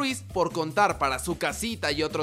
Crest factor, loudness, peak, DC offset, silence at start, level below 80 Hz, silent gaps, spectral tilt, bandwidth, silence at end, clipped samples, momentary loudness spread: 18 dB; -27 LUFS; -8 dBFS; under 0.1%; 0 s; -46 dBFS; none; -3.5 dB/octave; 16 kHz; 0 s; under 0.1%; 5 LU